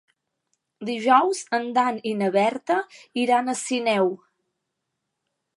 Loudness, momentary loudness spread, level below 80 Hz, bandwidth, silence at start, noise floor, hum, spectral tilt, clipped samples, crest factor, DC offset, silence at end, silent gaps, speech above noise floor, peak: -23 LUFS; 10 LU; -80 dBFS; 11.5 kHz; 0.8 s; -80 dBFS; none; -4 dB/octave; under 0.1%; 22 dB; under 0.1%; 1.4 s; none; 58 dB; -4 dBFS